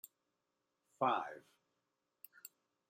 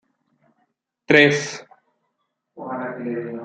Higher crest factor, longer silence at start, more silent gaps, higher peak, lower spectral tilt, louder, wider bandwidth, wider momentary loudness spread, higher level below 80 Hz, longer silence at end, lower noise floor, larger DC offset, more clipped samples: about the same, 24 dB vs 22 dB; second, 0.05 s vs 1.1 s; neither; second, -22 dBFS vs -2 dBFS; about the same, -4.5 dB/octave vs -4.5 dB/octave; second, -39 LUFS vs -19 LUFS; first, 16 kHz vs 9.2 kHz; about the same, 23 LU vs 21 LU; second, under -90 dBFS vs -64 dBFS; first, 0.4 s vs 0 s; first, -87 dBFS vs -75 dBFS; neither; neither